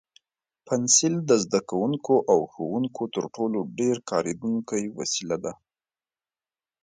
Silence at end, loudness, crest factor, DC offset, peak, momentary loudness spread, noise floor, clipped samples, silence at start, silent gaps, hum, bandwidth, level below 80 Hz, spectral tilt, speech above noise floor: 1.3 s; -25 LUFS; 22 dB; under 0.1%; -6 dBFS; 11 LU; under -90 dBFS; under 0.1%; 0.65 s; none; none; 9.6 kHz; -68 dBFS; -4 dB/octave; over 65 dB